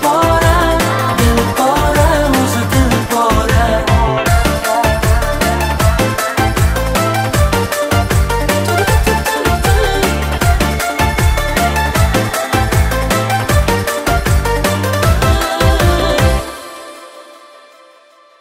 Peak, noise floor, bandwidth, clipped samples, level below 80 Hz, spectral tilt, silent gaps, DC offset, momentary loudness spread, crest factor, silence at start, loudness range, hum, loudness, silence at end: 0 dBFS; -45 dBFS; 16.5 kHz; under 0.1%; -18 dBFS; -5 dB/octave; none; under 0.1%; 3 LU; 12 dB; 0 s; 2 LU; none; -13 LUFS; 1.05 s